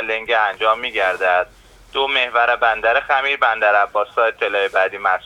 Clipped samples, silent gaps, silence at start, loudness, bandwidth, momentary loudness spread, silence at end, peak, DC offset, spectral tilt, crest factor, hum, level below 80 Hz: under 0.1%; none; 0 s; -17 LUFS; 12.5 kHz; 4 LU; 0.05 s; -2 dBFS; under 0.1%; -2.5 dB/octave; 16 dB; none; -52 dBFS